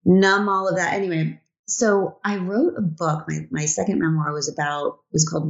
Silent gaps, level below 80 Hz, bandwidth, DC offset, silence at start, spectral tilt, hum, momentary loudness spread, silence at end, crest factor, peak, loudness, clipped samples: 1.59-1.64 s; -62 dBFS; 8 kHz; under 0.1%; 0.05 s; -5 dB/octave; none; 9 LU; 0 s; 16 dB; -4 dBFS; -22 LUFS; under 0.1%